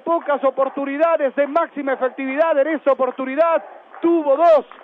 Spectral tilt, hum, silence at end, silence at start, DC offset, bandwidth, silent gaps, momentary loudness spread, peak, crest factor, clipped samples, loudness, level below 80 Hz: -6 dB/octave; none; 0.2 s; 0.05 s; under 0.1%; 5.6 kHz; none; 7 LU; -6 dBFS; 12 dB; under 0.1%; -18 LUFS; -74 dBFS